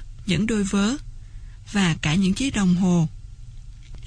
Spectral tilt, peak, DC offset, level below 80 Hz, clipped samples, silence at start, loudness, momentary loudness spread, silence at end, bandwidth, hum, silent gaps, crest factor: -5.5 dB/octave; -8 dBFS; under 0.1%; -38 dBFS; under 0.1%; 0 s; -22 LUFS; 9 LU; 0 s; 10.5 kHz; none; none; 16 dB